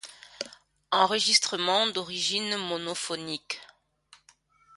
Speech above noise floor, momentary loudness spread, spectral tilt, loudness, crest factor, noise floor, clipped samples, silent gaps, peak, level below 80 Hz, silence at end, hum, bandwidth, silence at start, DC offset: 35 dB; 17 LU; -1.5 dB/octave; -26 LUFS; 24 dB; -63 dBFS; under 0.1%; none; -6 dBFS; -74 dBFS; 1.1 s; none; 11.5 kHz; 0.05 s; under 0.1%